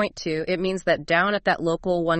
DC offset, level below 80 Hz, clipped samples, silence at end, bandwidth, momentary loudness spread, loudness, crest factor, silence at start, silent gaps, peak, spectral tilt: under 0.1%; -50 dBFS; under 0.1%; 0 s; 8.8 kHz; 5 LU; -23 LUFS; 16 dB; 0 s; none; -6 dBFS; -5.5 dB/octave